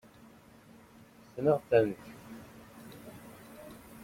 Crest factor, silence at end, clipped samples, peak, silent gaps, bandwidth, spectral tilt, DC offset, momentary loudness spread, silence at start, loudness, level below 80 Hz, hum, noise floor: 24 dB; 0 s; under 0.1%; -12 dBFS; none; 16.5 kHz; -7 dB/octave; under 0.1%; 24 LU; 1.35 s; -29 LUFS; -68 dBFS; none; -57 dBFS